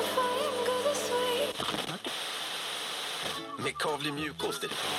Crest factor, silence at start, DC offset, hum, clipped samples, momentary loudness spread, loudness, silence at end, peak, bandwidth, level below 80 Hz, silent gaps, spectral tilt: 16 dB; 0 s; under 0.1%; none; under 0.1%; 5 LU; -32 LUFS; 0 s; -16 dBFS; 16 kHz; -68 dBFS; none; -2.5 dB/octave